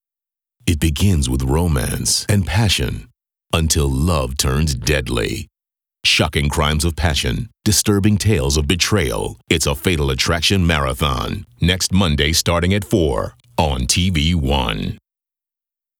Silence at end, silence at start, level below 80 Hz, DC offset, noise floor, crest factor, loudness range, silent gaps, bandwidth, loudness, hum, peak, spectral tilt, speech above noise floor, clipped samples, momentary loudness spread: 1.05 s; 0.65 s; -28 dBFS; under 0.1%; -87 dBFS; 18 dB; 2 LU; none; over 20 kHz; -17 LUFS; none; 0 dBFS; -4 dB/octave; 70 dB; under 0.1%; 7 LU